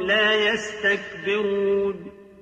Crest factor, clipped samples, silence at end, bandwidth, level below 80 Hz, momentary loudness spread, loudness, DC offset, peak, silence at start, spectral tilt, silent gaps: 14 dB; under 0.1%; 0.15 s; 8.8 kHz; -58 dBFS; 8 LU; -22 LUFS; under 0.1%; -8 dBFS; 0 s; -3.5 dB/octave; none